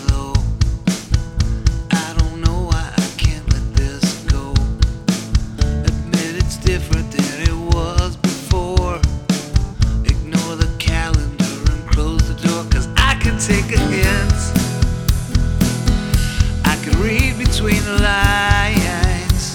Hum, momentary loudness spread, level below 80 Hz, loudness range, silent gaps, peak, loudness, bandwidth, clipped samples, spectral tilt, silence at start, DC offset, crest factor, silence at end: none; 5 LU; -20 dBFS; 3 LU; none; -2 dBFS; -18 LUFS; 18.5 kHz; under 0.1%; -5 dB/octave; 0 s; under 0.1%; 16 dB; 0 s